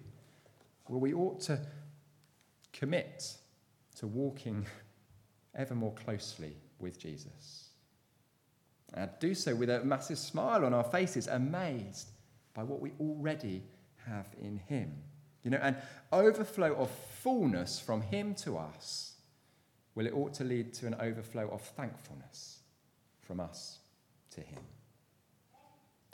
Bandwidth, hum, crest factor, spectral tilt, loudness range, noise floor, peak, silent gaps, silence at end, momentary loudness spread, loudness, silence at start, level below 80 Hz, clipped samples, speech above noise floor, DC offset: 18.5 kHz; none; 24 dB; -5.5 dB/octave; 12 LU; -72 dBFS; -14 dBFS; none; 1.35 s; 19 LU; -36 LUFS; 0 s; -74 dBFS; under 0.1%; 36 dB; under 0.1%